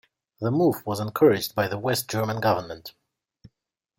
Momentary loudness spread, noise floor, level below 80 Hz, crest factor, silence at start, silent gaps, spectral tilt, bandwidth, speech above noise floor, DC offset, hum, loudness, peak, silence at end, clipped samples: 13 LU; -79 dBFS; -62 dBFS; 20 dB; 0.4 s; none; -5.5 dB/octave; 16.5 kHz; 55 dB; under 0.1%; none; -24 LUFS; -6 dBFS; 1.1 s; under 0.1%